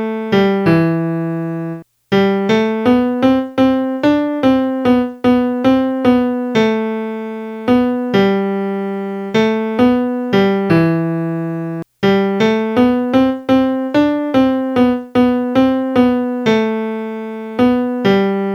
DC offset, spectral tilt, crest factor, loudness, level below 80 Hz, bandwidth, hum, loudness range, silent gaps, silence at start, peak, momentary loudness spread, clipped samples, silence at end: under 0.1%; -7.5 dB/octave; 14 dB; -15 LUFS; -48 dBFS; 7.2 kHz; none; 2 LU; none; 0 s; 0 dBFS; 8 LU; under 0.1%; 0 s